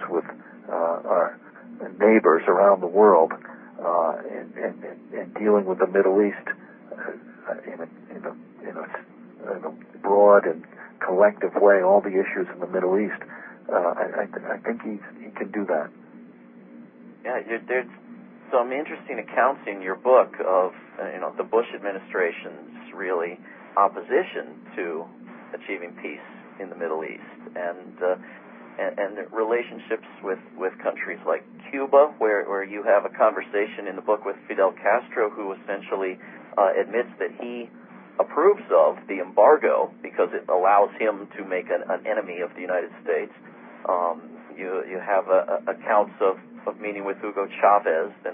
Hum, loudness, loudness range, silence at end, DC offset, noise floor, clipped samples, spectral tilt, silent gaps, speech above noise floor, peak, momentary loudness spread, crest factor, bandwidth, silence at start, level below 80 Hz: none; -23 LUFS; 11 LU; 0 s; under 0.1%; -47 dBFS; under 0.1%; -10 dB/octave; none; 24 dB; -4 dBFS; 19 LU; 20 dB; 3.7 kHz; 0 s; -86 dBFS